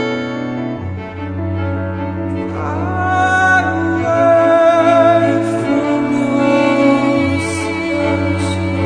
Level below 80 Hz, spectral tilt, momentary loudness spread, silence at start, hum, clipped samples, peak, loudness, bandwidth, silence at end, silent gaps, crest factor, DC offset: -44 dBFS; -6.5 dB/octave; 11 LU; 0 s; none; under 0.1%; 0 dBFS; -15 LUFS; 10 kHz; 0 s; none; 14 dB; under 0.1%